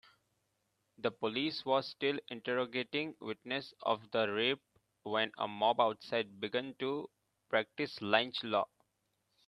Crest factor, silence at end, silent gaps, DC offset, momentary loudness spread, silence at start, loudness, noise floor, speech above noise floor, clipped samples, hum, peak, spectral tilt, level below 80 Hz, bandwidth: 26 dB; 0.85 s; none; under 0.1%; 8 LU; 1 s; -36 LUFS; -81 dBFS; 46 dB; under 0.1%; none; -12 dBFS; -5.5 dB/octave; -82 dBFS; 12 kHz